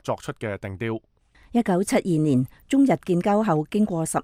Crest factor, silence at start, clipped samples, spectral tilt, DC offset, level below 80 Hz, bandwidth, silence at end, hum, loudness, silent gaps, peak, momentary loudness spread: 16 dB; 0.05 s; under 0.1%; -6.5 dB/octave; under 0.1%; -56 dBFS; 16 kHz; 0 s; none; -23 LUFS; none; -6 dBFS; 10 LU